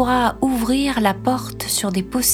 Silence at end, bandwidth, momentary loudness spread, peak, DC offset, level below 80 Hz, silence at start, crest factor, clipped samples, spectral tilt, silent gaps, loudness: 0 s; 18.5 kHz; 4 LU; -4 dBFS; under 0.1%; -40 dBFS; 0 s; 16 dB; under 0.1%; -3.5 dB/octave; none; -19 LUFS